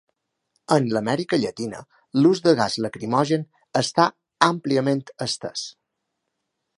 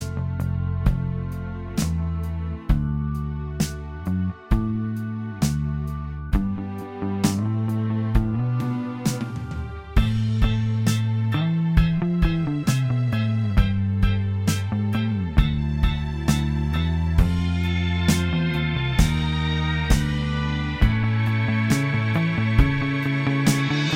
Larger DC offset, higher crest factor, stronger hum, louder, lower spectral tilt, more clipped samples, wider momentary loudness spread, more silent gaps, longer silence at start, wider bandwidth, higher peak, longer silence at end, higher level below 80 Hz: neither; about the same, 22 dB vs 20 dB; neither; about the same, -22 LUFS vs -24 LUFS; about the same, -5 dB/octave vs -6 dB/octave; neither; first, 11 LU vs 7 LU; neither; first, 0.7 s vs 0 s; second, 11.5 kHz vs 17 kHz; about the same, 0 dBFS vs -2 dBFS; first, 1.1 s vs 0 s; second, -66 dBFS vs -28 dBFS